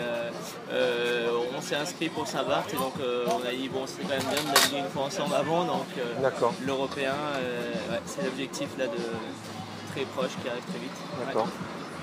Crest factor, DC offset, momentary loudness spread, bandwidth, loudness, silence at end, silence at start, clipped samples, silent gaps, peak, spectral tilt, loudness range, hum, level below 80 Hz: 26 dB; under 0.1%; 9 LU; 15.5 kHz; -30 LUFS; 0 s; 0 s; under 0.1%; none; -4 dBFS; -3.5 dB/octave; 6 LU; none; -68 dBFS